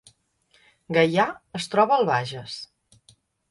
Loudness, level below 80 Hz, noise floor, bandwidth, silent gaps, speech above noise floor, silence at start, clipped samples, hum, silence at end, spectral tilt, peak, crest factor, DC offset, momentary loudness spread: -23 LUFS; -66 dBFS; -64 dBFS; 11.5 kHz; none; 41 dB; 0.9 s; under 0.1%; none; 0.85 s; -5.5 dB/octave; -6 dBFS; 20 dB; under 0.1%; 17 LU